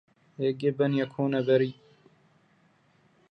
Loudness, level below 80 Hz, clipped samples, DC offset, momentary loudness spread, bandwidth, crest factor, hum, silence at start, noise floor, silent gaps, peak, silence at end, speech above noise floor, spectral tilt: -27 LUFS; -76 dBFS; under 0.1%; under 0.1%; 7 LU; 6 kHz; 18 dB; none; 0.4 s; -65 dBFS; none; -12 dBFS; 1.6 s; 39 dB; -9 dB/octave